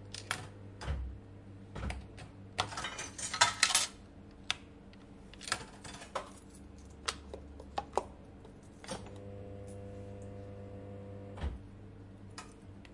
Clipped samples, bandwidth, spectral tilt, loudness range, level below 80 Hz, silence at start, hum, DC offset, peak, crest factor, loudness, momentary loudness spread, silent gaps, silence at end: under 0.1%; 11.5 kHz; -2 dB/octave; 13 LU; -52 dBFS; 0 s; none; under 0.1%; -8 dBFS; 32 dB; -38 LUFS; 21 LU; none; 0 s